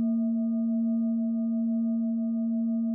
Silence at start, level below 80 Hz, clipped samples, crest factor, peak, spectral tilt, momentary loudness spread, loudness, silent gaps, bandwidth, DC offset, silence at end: 0 s; -72 dBFS; under 0.1%; 6 dB; -22 dBFS; -8.5 dB/octave; 1 LU; -28 LUFS; none; 1.3 kHz; under 0.1%; 0 s